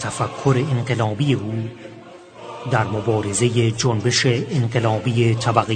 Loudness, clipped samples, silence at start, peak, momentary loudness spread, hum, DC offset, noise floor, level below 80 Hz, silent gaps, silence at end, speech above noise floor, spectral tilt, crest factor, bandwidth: -20 LUFS; under 0.1%; 0 s; 0 dBFS; 14 LU; none; under 0.1%; -41 dBFS; -52 dBFS; none; 0 s; 21 dB; -5.5 dB/octave; 20 dB; 9.4 kHz